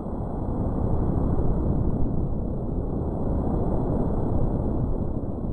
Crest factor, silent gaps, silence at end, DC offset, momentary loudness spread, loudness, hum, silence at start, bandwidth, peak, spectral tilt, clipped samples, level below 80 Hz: 12 dB; none; 0 s; under 0.1%; 4 LU; -27 LUFS; none; 0 s; 2 kHz; -12 dBFS; -12.5 dB/octave; under 0.1%; -28 dBFS